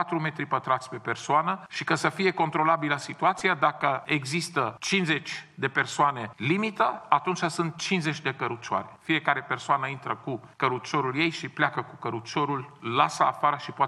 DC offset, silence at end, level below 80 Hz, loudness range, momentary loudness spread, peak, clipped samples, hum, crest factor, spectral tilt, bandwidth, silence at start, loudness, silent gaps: under 0.1%; 0 s; -72 dBFS; 3 LU; 8 LU; -4 dBFS; under 0.1%; none; 22 dB; -4.5 dB/octave; 12.5 kHz; 0 s; -27 LUFS; none